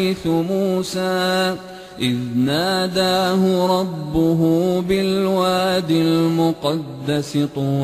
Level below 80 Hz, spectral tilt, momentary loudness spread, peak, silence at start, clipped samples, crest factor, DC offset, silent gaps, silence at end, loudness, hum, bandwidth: -48 dBFS; -6 dB/octave; 6 LU; -6 dBFS; 0 s; under 0.1%; 12 dB; under 0.1%; none; 0 s; -19 LUFS; none; 15.5 kHz